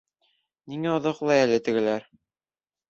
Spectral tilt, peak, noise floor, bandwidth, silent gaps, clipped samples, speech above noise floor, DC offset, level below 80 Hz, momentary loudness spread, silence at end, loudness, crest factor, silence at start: -5.5 dB/octave; -6 dBFS; under -90 dBFS; 7.8 kHz; none; under 0.1%; over 66 dB; under 0.1%; -68 dBFS; 11 LU; 0.9 s; -24 LUFS; 20 dB; 0.65 s